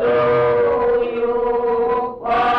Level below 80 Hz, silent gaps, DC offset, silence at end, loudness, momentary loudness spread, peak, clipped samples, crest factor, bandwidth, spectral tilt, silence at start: -44 dBFS; none; under 0.1%; 0 s; -18 LUFS; 4 LU; -10 dBFS; under 0.1%; 8 dB; 5.4 kHz; -7.5 dB/octave; 0 s